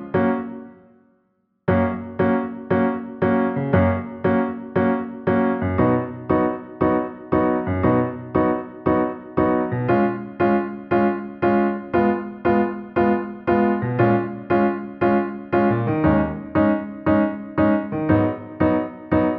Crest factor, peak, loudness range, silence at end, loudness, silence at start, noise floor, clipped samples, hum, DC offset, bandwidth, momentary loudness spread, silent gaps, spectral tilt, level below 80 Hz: 16 dB; -4 dBFS; 1 LU; 0 s; -21 LUFS; 0 s; -67 dBFS; under 0.1%; none; under 0.1%; 5 kHz; 4 LU; none; -11.5 dB/octave; -46 dBFS